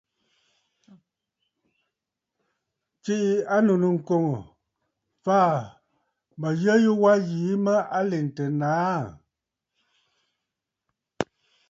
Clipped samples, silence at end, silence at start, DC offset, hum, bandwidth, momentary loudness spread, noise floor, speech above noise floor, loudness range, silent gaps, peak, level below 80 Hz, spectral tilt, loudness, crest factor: under 0.1%; 0.45 s; 3.05 s; under 0.1%; none; 7.8 kHz; 14 LU; -85 dBFS; 63 dB; 8 LU; none; -6 dBFS; -68 dBFS; -7.5 dB/octave; -24 LUFS; 20 dB